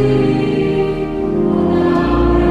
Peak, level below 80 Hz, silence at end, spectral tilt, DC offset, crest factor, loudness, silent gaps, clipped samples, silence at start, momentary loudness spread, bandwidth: -2 dBFS; -26 dBFS; 0 s; -8.5 dB/octave; under 0.1%; 12 dB; -15 LUFS; none; under 0.1%; 0 s; 5 LU; 9.6 kHz